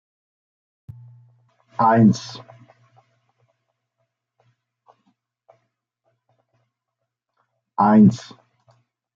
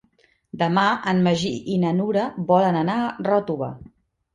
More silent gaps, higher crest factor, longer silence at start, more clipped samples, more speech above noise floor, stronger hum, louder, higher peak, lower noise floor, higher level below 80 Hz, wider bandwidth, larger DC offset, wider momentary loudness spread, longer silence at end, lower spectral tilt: neither; about the same, 20 dB vs 18 dB; first, 1.8 s vs 0.55 s; neither; first, 66 dB vs 41 dB; neither; first, -16 LUFS vs -22 LUFS; about the same, -4 dBFS vs -4 dBFS; first, -81 dBFS vs -62 dBFS; second, -64 dBFS vs -58 dBFS; second, 7.4 kHz vs 9.2 kHz; neither; first, 22 LU vs 10 LU; first, 1 s vs 0.5 s; about the same, -7.5 dB/octave vs -6.5 dB/octave